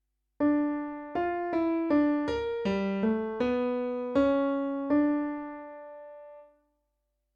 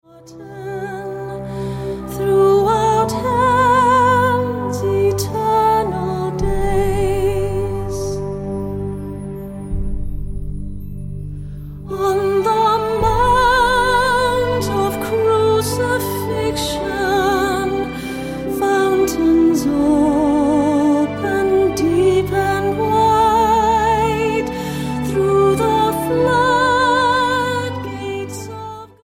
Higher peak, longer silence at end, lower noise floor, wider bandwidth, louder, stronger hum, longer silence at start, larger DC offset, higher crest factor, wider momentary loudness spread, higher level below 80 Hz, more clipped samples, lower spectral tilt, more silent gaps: second, -14 dBFS vs -4 dBFS; first, 0.9 s vs 0.15 s; first, -80 dBFS vs -37 dBFS; second, 6.8 kHz vs 17 kHz; second, -29 LUFS vs -17 LUFS; neither; first, 0.4 s vs 0.15 s; neither; about the same, 14 dB vs 12 dB; about the same, 17 LU vs 15 LU; second, -58 dBFS vs -32 dBFS; neither; first, -8 dB/octave vs -5.5 dB/octave; neither